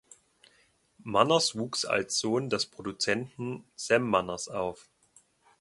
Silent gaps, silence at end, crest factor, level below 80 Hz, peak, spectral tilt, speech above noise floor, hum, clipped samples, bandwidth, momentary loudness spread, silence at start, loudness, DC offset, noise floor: none; 0.8 s; 24 dB; -66 dBFS; -6 dBFS; -3.5 dB/octave; 38 dB; none; under 0.1%; 11.5 kHz; 13 LU; 1.05 s; -29 LUFS; under 0.1%; -67 dBFS